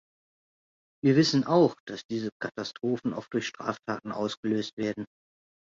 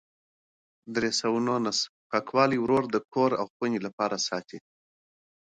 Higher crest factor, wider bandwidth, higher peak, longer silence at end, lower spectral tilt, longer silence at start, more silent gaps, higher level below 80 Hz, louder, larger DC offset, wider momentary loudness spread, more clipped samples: about the same, 20 dB vs 22 dB; second, 7.8 kHz vs 9.6 kHz; about the same, -10 dBFS vs -8 dBFS; second, 0.75 s vs 0.9 s; first, -6 dB/octave vs -4 dB/octave; first, 1.05 s vs 0.85 s; second, 1.80-1.87 s, 2.05-2.09 s, 2.32-2.40 s, 4.37-4.43 s, 4.73-4.77 s vs 1.89-2.10 s, 3.50-3.60 s, 3.93-3.98 s; about the same, -68 dBFS vs -66 dBFS; about the same, -28 LUFS vs -27 LUFS; neither; first, 12 LU vs 7 LU; neither